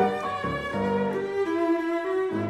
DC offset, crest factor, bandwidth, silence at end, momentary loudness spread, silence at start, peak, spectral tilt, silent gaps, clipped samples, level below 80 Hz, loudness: under 0.1%; 14 dB; 12 kHz; 0 s; 4 LU; 0 s; -12 dBFS; -7 dB/octave; none; under 0.1%; -54 dBFS; -27 LUFS